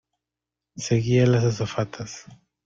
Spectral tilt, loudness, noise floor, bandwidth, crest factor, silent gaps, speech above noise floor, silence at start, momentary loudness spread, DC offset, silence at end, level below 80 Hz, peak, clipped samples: -6.5 dB/octave; -22 LUFS; -87 dBFS; 7.6 kHz; 18 dB; none; 64 dB; 0.75 s; 17 LU; under 0.1%; 0.3 s; -54 dBFS; -8 dBFS; under 0.1%